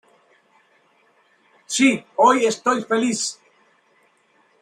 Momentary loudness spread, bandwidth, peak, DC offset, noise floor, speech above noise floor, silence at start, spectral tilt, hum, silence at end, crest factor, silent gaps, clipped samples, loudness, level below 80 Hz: 10 LU; 13 kHz; -2 dBFS; under 0.1%; -61 dBFS; 42 dB; 1.7 s; -3 dB/octave; none; 1.3 s; 20 dB; none; under 0.1%; -19 LUFS; -72 dBFS